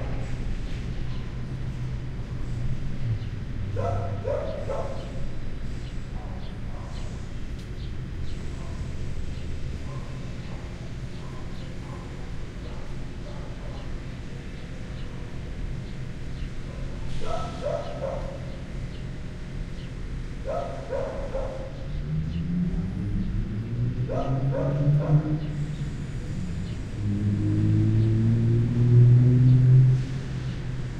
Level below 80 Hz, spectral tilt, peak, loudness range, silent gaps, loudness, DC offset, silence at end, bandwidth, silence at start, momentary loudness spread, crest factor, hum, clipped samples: -34 dBFS; -8.5 dB/octave; -8 dBFS; 16 LU; none; -28 LUFS; under 0.1%; 0 s; 8.6 kHz; 0 s; 15 LU; 20 dB; none; under 0.1%